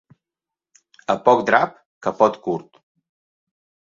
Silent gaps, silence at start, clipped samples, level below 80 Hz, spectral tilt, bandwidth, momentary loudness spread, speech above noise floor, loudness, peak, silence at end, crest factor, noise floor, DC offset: 1.86-2.01 s; 1.1 s; under 0.1%; -64 dBFS; -5.5 dB/octave; 7.6 kHz; 12 LU; 70 dB; -20 LUFS; 0 dBFS; 1.25 s; 22 dB; -88 dBFS; under 0.1%